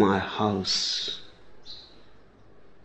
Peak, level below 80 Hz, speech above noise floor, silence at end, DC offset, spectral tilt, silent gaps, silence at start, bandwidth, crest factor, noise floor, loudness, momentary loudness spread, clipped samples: -8 dBFS; -60 dBFS; 28 dB; 0 s; under 0.1%; -4 dB/octave; none; 0 s; 8.6 kHz; 20 dB; -54 dBFS; -26 LUFS; 20 LU; under 0.1%